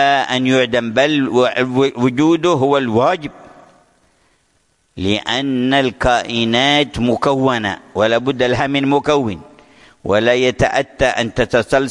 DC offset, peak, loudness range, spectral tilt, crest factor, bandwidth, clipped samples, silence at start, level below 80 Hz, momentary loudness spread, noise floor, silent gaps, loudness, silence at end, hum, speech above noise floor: under 0.1%; -2 dBFS; 4 LU; -5 dB/octave; 14 dB; 11.5 kHz; under 0.1%; 0 s; -40 dBFS; 5 LU; -61 dBFS; none; -15 LUFS; 0 s; none; 46 dB